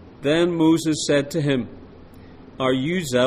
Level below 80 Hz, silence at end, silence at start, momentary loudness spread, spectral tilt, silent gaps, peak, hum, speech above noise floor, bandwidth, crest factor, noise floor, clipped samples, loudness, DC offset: -50 dBFS; 0 s; 0 s; 7 LU; -5 dB/octave; none; -6 dBFS; none; 23 dB; 15 kHz; 16 dB; -43 dBFS; under 0.1%; -21 LUFS; under 0.1%